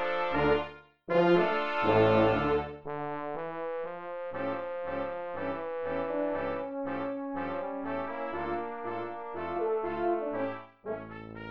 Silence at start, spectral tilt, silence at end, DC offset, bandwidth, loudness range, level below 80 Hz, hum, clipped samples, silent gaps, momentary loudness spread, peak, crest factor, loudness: 0 s; -8 dB/octave; 0 s; 0.3%; 6.6 kHz; 8 LU; -56 dBFS; none; under 0.1%; none; 13 LU; -12 dBFS; 18 dB; -31 LUFS